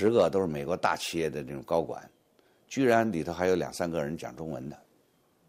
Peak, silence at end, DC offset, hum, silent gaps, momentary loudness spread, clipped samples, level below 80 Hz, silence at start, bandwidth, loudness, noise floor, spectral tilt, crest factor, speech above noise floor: -10 dBFS; 0.7 s; under 0.1%; none; none; 14 LU; under 0.1%; -60 dBFS; 0 s; 15.5 kHz; -30 LUFS; -67 dBFS; -5.5 dB/octave; 20 dB; 39 dB